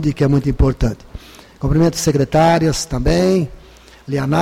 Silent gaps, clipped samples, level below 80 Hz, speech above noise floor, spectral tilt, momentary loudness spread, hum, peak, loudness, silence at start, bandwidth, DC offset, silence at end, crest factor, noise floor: none; under 0.1%; -26 dBFS; 21 dB; -6 dB/octave; 10 LU; none; -4 dBFS; -16 LUFS; 0 s; 16 kHz; under 0.1%; 0 s; 12 dB; -36 dBFS